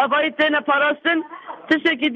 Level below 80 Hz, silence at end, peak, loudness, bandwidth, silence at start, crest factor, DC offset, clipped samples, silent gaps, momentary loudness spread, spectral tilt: -68 dBFS; 0 s; -6 dBFS; -19 LUFS; 7.2 kHz; 0 s; 14 dB; under 0.1%; under 0.1%; none; 9 LU; -4.5 dB/octave